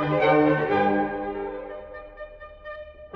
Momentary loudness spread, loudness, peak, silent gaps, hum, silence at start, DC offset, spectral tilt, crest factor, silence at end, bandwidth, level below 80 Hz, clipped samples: 22 LU; -23 LUFS; -8 dBFS; none; none; 0 s; under 0.1%; -9 dB/octave; 16 dB; 0 s; 5.8 kHz; -52 dBFS; under 0.1%